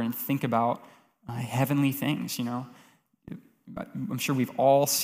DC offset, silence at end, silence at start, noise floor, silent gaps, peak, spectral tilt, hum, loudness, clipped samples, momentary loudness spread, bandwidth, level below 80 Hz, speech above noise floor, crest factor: under 0.1%; 0 s; 0 s; -49 dBFS; none; -10 dBFS; -5 dB/octave; none; -28 LUFS; under 0.1%; 23 LU; 16 kHz; -68 dBFS; 22 dB; 18 dB